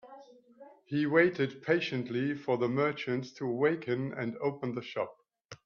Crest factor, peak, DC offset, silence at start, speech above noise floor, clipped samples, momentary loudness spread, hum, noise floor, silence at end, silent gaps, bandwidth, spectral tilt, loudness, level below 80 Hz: 20 dB; -12 dBFS; under 0.1%; 0.05 s; 25 dB; under 0.1%; 10 LU; none; -56 dBFS; 0.1 s; 5.45-5.49 s; 7 kHz; -7 dB/octave; -32 LUFS; -74 dBFS